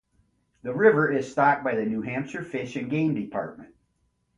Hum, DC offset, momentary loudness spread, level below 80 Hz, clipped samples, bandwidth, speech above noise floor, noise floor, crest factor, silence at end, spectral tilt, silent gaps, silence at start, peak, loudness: none; under 0.1%; 13 LU; -64 dBFS; under 0.1%; 7.8 kHz; 47 dB; -72 dBFS; 20 dB; 0.7 s; -7.5 dB/octave; none; 0.65 s; -6 dBFS; -25 LUFS